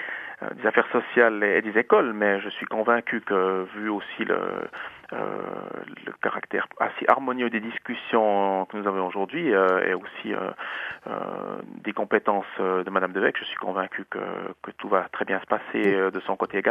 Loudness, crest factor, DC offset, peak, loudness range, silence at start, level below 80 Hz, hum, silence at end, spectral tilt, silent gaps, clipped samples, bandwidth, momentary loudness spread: -25 LUFS; 26 dB; under 0.1%; 0 dBFS; 5 LU; 0 s; -74 dBFS; none; 0 s; -7 dB/octave; none; under 0.1%; 5.2 kHz; 12 LU